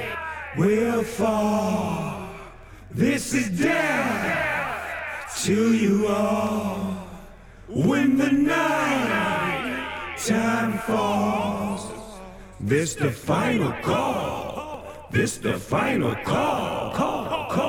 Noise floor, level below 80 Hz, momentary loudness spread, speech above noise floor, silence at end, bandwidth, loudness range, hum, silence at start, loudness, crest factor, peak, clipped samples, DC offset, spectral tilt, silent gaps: -44 dBFS; -50 dBFS; 12 LU; 22 dB; 0 s; 18.5 kHz; 3 LU; none; 0 s; -24 LUFS; 16 dB; -8 dBFS; under 0.1%; under 0.1%; -5 dB/octave; none